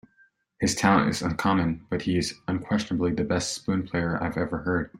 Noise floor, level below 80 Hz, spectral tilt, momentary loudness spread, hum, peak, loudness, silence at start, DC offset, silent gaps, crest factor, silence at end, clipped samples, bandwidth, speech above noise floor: -63 dBFS; -50 dBFS; -5 dB/octave; 8 LU; none; -4 dBFS; -26 LUFS; 0.6 s; under 0.1%; none; 22 dB; 0 s; under 0.1%; 16 kHz; 37 dB